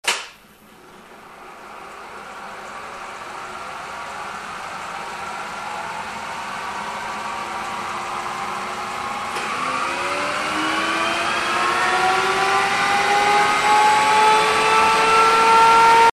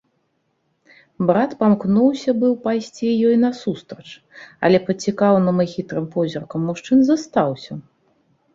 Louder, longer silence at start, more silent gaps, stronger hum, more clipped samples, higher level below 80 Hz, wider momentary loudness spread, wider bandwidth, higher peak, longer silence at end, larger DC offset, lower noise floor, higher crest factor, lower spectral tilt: about the same, -18 LUFS vs -19 LUFS; second, 0.05 s vs 1.2 s; neither; neither; neither; first, -54 dBFS vs -60 dBFS; first, 19 LU vs 16 LU; first, 14 kHz vs 7.8 kHz; second, -6 dBFS vs -2 dBFS; second, 0 s vs 0.75 s; neither; second, -47 dBFS vs -68 dBFS; about the same, 14 dB vs 16 dB; second, -1.5 dB/octave vs -7 dB/octave